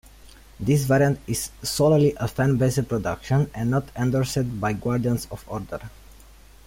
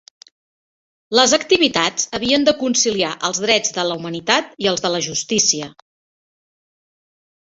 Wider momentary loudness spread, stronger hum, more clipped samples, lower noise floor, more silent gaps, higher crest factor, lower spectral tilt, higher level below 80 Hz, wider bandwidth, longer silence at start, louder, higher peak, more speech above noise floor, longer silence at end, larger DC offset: first, 13 LU vs 7 LU; neither; neither; second, -48 dBFS vs under -90 dBFS; neither; about the same, 16 dB vs 18 dB; first, -6 dB/octave vs -2 dB/octave; first, -46 dBFS vs -58 dBFS; first, 16.5 kHz vs 8.2 kHz; second, 0.6 s vs 1.1 s; second, -23 LUFS vs -17 LUFS; second, -8 dBFS vs -2 dBFS; second, 26 dB vs over 72 dB; second, 0.75 s vs 1.85 s; neither